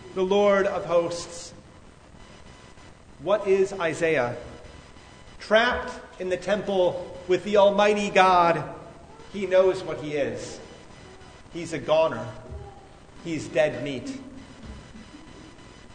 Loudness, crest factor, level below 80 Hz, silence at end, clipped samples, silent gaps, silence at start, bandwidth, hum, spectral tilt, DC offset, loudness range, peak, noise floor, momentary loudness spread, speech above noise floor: -24 LUFS; 22 dB; -52 dBFS; 0 s; under 0.1%; none; 0 s; 9.6 kHz; none; -5 dB/octave; under 0.1%; 8 LU; -4 dBFS; -49 dBFS; 24 LU; 26 dB